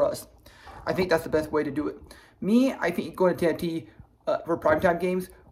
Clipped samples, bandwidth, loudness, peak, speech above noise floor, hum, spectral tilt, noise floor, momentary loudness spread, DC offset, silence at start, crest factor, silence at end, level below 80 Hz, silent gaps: under 0.1%; 16 kHz; -26 LUFS; -10 dBFS; 24 dB; none; -6.5 dB/octave; -49 dBFS; 13 LU; under 0.1%; 0 s; 18 dB; 0.2 s; -52 dBFS; none